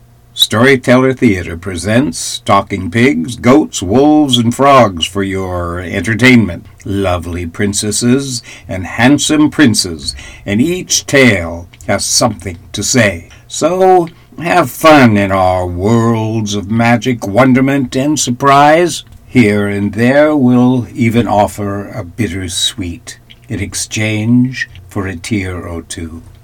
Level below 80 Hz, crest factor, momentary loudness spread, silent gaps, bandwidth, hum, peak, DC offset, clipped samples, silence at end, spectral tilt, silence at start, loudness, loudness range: -38 dBFS; 12 dB; 15 LU; none; 18.5 kHz; none; 0 dBFS; under 0.1%; 1%; 0.15 s; -4.5 dB/octave; 0.35 s; -11 LUFS; 6 LU